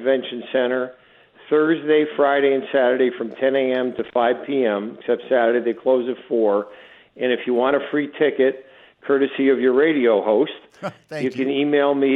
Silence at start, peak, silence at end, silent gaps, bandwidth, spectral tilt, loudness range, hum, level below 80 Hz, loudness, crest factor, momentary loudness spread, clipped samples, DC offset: 0 s; -4 dBFS; 0 s; none; 5.6 kHz; -7 dB/octave; 2 LU; none; -70 dBFS; -20 LUFS; 14 dB; 9 LU; under 0.1%; under 0.1%